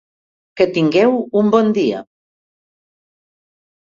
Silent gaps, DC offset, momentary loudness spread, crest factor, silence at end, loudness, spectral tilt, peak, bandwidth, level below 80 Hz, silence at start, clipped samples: none; under 0.1%; 6 LU; 16 dB; 1.85 s; -15 LUFS; -7 dB/octave; -2 dBFS; 7.4 kHz; -60 dBFS; 0.55 s; under 0.1%